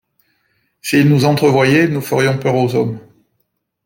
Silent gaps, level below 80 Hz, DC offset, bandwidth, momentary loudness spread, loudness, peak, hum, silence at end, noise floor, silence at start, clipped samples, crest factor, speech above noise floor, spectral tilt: none; -54 dBFS; under 0.1%; 17 kHz; 10 LU; -14 LUFS; -2 dBFS; none; 0.85 s; -69 dBFS; 0.85 s; under 0.1%; 14 dB; 56 dB; -6.5 dB/octave